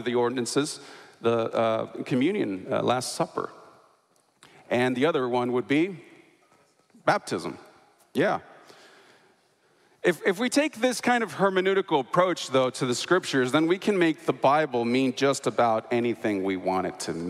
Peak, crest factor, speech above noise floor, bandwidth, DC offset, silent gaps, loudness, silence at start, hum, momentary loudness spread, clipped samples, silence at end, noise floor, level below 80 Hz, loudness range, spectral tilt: -8 dBFS; 18 dB; 41 dB; 15 kHz; under 0.1%; none; -26 LUFS; 0 s; none; 7 LU; under 0.1%; 0 s; -66 dBFS; -72 dBFS; 7 LU; -4.5 dB/octave